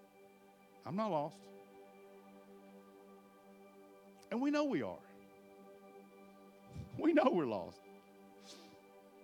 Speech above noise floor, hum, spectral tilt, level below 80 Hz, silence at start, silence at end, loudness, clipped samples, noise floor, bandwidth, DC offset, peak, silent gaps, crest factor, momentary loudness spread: 28 dB; none; -6.5 dB/octave; -78 dBFS; 0.85 s; 0.25 s; -37 LUFS; under 0.1%; -64 dBFS; 17 kHz; under 0.1%; -18 dBFS; none; 24 dB; 26 LU